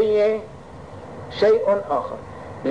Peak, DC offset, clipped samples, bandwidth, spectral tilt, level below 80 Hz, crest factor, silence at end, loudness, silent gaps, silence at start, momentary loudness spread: -10 dBFS; 0.3%; under 0.1%; 9.4 kHz; -6.5 dB/octave; -52 dBFS; 12 dB; 0 s; -21 LUFS; none; 0 s; 21 LU